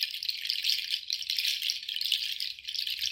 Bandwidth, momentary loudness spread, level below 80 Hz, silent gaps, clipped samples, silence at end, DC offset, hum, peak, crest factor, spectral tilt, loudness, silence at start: 16.5 kHz; 5 LU; -74 dBFS; none; under 0.1%; 0 s; under 0.1%; none; -10 dBFS; 22 dB; 5 dB/octave; -29 LUFS; 0 s